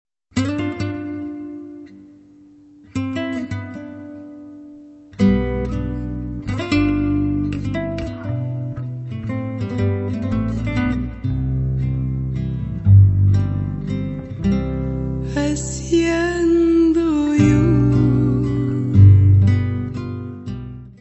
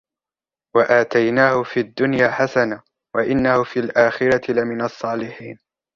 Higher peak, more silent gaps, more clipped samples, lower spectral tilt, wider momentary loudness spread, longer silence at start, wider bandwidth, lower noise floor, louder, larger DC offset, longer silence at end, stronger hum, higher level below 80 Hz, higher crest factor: about the same, 0 dBFS vs -2 dBFS; neither; neither; first, -8 dB/octave vs -6.5 dB/octave; first, 16 LU vs 11 LU; second, 0.35 s vs 0.75 s; first, 8.4 kHz vs 7.4 kHz; second, -46 dBFS vs under -90 dBFS; about the same, -19 LUFS vs -18 LUFS; neither; second, 0.1 s vs 0.4 s; neither; first, -32 dBFS vs -54 dBFS; about the same, 18 dB vs 18 dB